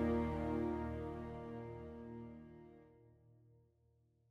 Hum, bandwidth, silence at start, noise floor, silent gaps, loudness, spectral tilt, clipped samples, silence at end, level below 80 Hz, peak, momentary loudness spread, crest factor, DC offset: none; 7.6 kHz; 0 s; -75 dBFS; none; -44 LUFS; -9 dB/octave; under 0.1%; 0.95 s; -56 dBFS; -26 dBFS; 20 LU; 18 dB; under 0.1%